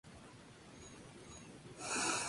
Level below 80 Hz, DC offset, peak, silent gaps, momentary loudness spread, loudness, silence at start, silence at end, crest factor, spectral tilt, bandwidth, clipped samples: -68 dBFS; under 0.1%; -24 dBFS; none; 20 LU; -44 LUFS; 0.05 s; 0 s; 20 dB; -1.5 dB/octave; 11.5 kHz; under 0.1%